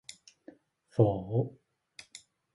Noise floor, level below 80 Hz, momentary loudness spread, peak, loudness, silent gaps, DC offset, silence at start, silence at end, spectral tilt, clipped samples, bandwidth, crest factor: -57 dBFS; -60 dBFS; 25 LU; -10 dBFS; -31 LUFS; none; under 0.1%; 0.95 s; 1.05 s; -8 dB/octave; under 0.1%; 11.5 kHz; 24 dB